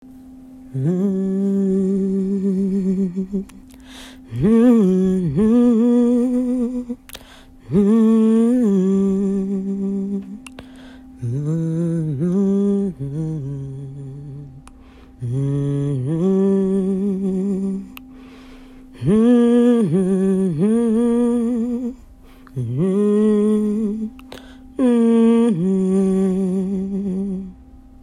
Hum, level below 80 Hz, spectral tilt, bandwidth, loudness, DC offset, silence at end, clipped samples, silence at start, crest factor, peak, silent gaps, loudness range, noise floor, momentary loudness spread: none; -48 dBFS; -9 dB/octave; 11.5 kHz; -18 LUFS; under 0.1%; 0.25 s; under 0.1%; 0.05 s; 14 dB; -4 dBFS; none; 6 LU; -43 dBFS; 18 LU